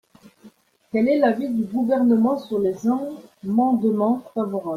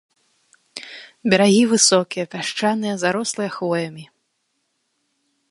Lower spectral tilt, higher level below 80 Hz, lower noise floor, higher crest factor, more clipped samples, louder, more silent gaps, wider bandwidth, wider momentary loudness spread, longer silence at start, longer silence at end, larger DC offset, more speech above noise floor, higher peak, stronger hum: first, -8 dB/octave vs -3.5 dB/octave; first, -64 dBFS vs -70 dBFS; second, -51 dBFS vs -71 dBFS; about the same, 16 dB vs 20 dB; neither; second, -21 LUFS vs -18 LUFS; neither; second, 7 kHz vs 11.5 kHz; second, 8 LU vs 21 LU; second, 0.45 s vs 0.75 s; second, 0 s vs 1.45 s; neither; second, 31 dB vs 53 dB; second, -6 dBFS vs 0 dBFS; neither